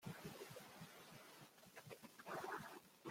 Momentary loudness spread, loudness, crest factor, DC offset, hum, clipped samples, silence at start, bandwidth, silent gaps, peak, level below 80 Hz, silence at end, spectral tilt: 11 LU; -56 LUFS; 18 dB; under 0.1%; none; under 0.1%; 0 s; 16.5 kHz; none; -38 dBFS; -84 dBFS; 0 s; -4 dB/octave